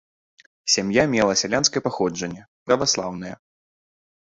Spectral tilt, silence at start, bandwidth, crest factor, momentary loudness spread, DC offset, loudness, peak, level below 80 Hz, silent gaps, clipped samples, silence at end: -3 dB/octave; 0.65 s; 8 kHz; 22 dB; 14 LU; under 0.1%; -21 LUFS; -2 dBFS; -56 dBFS; 2.48-2.66 s; under 0.1%; 1 s